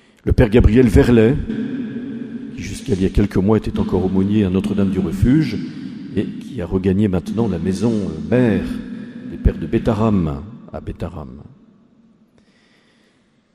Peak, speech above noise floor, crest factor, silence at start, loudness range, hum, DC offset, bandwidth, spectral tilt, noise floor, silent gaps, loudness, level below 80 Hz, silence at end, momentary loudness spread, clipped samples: 0 dBFS; 41 dB; 18 dB; 0.25 s; 7 LU; none; under 0.1%; 13.5 kHz; -8 dB/octave; -58 dBFS; none; -18 LUFS; -28 dBFS; 2.1 s; 17 LU; under 0.1%